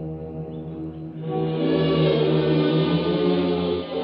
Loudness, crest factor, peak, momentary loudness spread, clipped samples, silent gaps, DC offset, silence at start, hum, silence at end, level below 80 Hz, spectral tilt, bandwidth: -22 LUFS; 14 dB; -8 dBFS; 13 LU; under 0.1%; none; under 0.1%; 0 s; none; 0 s; -48 dBFS; -10.5 dB/octave; 5.4 kHz